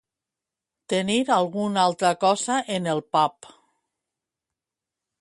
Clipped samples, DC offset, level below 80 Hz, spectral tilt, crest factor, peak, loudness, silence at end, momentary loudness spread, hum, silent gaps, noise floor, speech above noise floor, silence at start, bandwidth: under 0.1%; under 0.1%; -72 dBFS; -4 dB/octave; 20 dB; -6 dBFS; -23 LUFS; 1.9 s; 5 LU; none; none; -88 dBFS; 65 dB; 0.9 s; 11.5 kHz